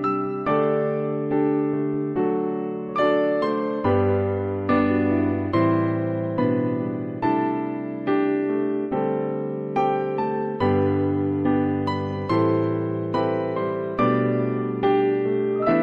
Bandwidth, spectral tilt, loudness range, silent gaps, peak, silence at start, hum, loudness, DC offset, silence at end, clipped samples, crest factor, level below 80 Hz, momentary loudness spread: 5.6 kHz; -9.5 dB/octave; 2 LU; none; -8 dBFS; 0 s; none; -23 LUFS; under 0.1%; 0 s; under 0.1%; 14 dB; -58 dBFS; 5 LU